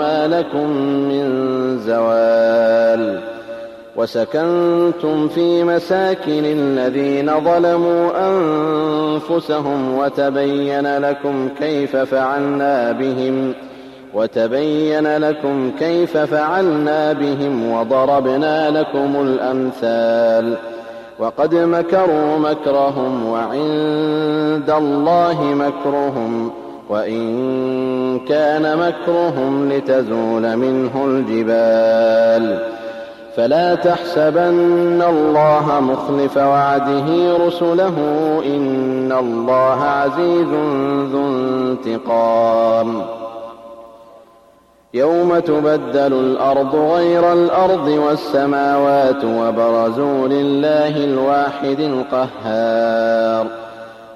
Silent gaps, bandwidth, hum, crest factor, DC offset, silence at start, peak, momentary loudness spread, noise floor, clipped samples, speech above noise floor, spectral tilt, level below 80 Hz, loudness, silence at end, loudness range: none; 12.5 kHz; none; 12 dB; under 0.1%; 0 s; -4 dBFS; 7 LU; -50 dBFS; under 0.1%; 35 dB; -7.5 dB/octave; -58 dBFS; -16 LUFS; 0 s; 4 LU